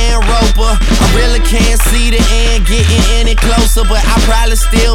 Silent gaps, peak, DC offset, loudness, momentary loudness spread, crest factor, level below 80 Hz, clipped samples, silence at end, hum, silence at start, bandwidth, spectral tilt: none; 0 dBFS; under 0.1%; -11 LUFS; 2 LU; 8 dB; -8 dBFS; under 0.1%; 0 s; none; 0 s; 15.5 kHz; -4 dB/octave